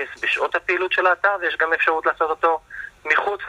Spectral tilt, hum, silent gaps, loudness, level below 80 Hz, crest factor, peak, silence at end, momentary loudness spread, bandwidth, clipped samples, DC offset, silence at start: -3 dB/octave; none; none; -20 LUFS; -58 dBFS; 18 dB; -4 dBFS; 0 s; 4 LU; 12.5 kHz; under 0.1%; under 0.1%; 0 s